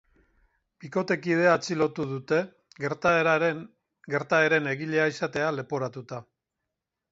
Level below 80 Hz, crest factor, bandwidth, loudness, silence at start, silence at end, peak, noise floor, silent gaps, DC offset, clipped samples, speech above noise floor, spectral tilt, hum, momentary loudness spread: -68 dBFS; 20 dB; 7.8 kHz; -26 LUFS; 0.8 s; 0.9 s; -8 dBFS; -85 dBFS; none; under 0.1%; under 0.1%; 59 dB; -5.5 dB/octave; none; 13 LU